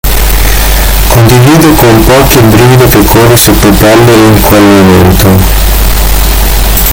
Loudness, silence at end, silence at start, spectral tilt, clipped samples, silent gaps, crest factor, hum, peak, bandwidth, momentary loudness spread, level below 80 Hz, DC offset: -3 LUFS; 0 s; 0.05 s; -5 dB/octave; 20%; none; 2 dB; none; 0 dBFS; over 20 kHz; 5 LU; -10 dBFS; under 0.1%